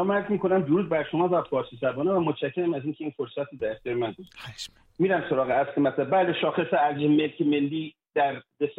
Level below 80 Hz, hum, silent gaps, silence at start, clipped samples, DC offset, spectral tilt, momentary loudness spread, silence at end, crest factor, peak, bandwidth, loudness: -64 dBFS; none; none; 0 s; under 0.1%; under 0.1%; -7 dB/octave; 10 LU; 0.05 s; 12 dB; -12 dBFS; 9 kHz; -26 LUFS